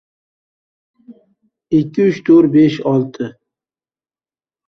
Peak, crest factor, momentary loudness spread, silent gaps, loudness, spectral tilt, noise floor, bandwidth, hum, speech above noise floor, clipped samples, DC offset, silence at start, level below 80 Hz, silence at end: -2 dBFS; 16 dB; 15 LU; none; -14 LUFS; -8.5 dB/octave; under -90 dBFS; 6.4 kHz; none; over 77 dB; under 0.1%; under 0.1%; 1.1 s; -58 dBFS; 1.35 s